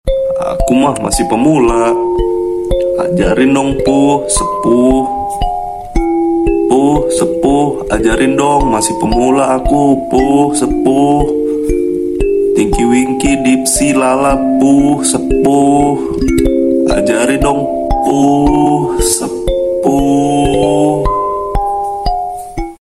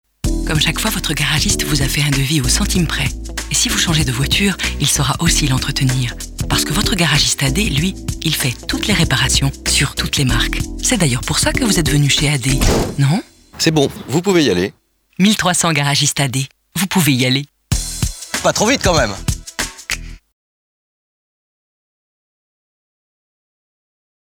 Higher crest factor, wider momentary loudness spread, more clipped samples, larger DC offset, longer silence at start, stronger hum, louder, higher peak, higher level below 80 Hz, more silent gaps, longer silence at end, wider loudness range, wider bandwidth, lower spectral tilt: second, 10 dB vs 16 dB; about the same, 6 LU vs 8 LU; neither; neither; second, 0.05 s vs 0.25 s; neither; first, -12 LUFS vs -15 LUFS; about the same, 0 dBFS vs 0 dBFS; about the same, -24 dBFS vs -28 dBFS; neither; second, 0.1 s vs 4.05 s; about the same, 2 LU vs 4 LU; second, 14 kHz vs over 20 kHz; first, -5 dB/octave vs -3.5 dB/octave